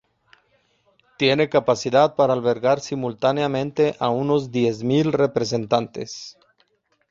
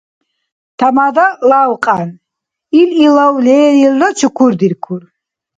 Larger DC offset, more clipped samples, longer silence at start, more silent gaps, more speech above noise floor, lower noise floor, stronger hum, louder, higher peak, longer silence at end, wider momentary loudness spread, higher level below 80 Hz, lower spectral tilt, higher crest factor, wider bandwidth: neither; neither; first, 1.2 s vs 0.8 s; neither; second, 45 dB vs 68 dB; second, -65 dBFS vs -78 dBFS; neither; second, -21 LUFS vs -10 LUFS; about the same, -2 dBFS vs 0 dBFS; first, 0.8 s vs 0.6 s; about the same, 9 LU vs 9 LU; about the same, -60 dBFS vs -58 dBFS; about the same, -5.5 dB/octave vs -5.5 dB/octave; first, 18 dB vs 12 dB; second, 7.8 kHz vs 9.2 kHz